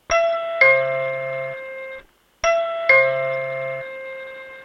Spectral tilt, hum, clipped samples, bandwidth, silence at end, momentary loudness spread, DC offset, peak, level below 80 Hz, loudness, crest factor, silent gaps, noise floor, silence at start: -2.5 dB/octave; none; under 0.1%; 6.8 kHz; 0 s; 19 LU; under 0.1%; -2 dBFS; -54 dBFS; -19 LUFS; 20 dB; none; -43 dBFS; 0.1 s